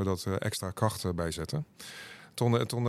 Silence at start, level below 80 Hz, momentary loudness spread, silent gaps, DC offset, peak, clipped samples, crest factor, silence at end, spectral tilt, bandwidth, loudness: 0 s; -54 dBFS; 15 LU; none; under 0.1%; -12 dBFS; under 0.1%; 20 dB; 0 s; -5.5 dB/octave; 14.5 kHz; -32 LUFS